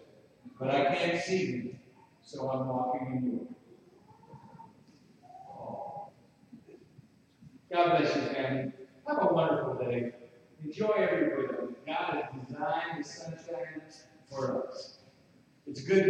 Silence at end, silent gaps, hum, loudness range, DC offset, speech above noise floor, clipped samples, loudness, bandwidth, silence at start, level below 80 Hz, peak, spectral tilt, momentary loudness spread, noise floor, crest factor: 0 s; none; none; 17 LU; under 0.1%; 32 dB; under 0.1%; -32 LUFS; 9.8 kHz; 0 s; -74 dBFS; -12 dBFS; -6 dB/octave; 21 LU; -63 dBFS; 22 dB